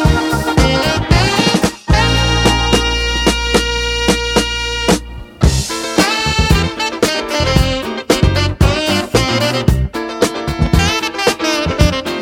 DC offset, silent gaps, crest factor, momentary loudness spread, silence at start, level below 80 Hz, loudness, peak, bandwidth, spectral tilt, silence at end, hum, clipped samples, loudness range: under 0.1%; none; 14 dB; 5 LU; 0 s; -20 dBFS; -14 LUFS; 0 dBFS; 17.5 kHz; -4.5 dB/octave; 0 s; none; under 0.1%; 2 LU